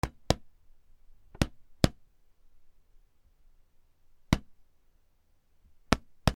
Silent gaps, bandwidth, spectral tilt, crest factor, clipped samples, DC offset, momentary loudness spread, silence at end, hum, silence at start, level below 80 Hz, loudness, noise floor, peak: none; 19 kHz; -5 dB/octave; 36 dB; under 0.1%; under 0.1%; 4 LU; 0.05 s; none; 0.05 s; -44 dBFS; -32 LUFS; -66 dBFS; 0 dBFS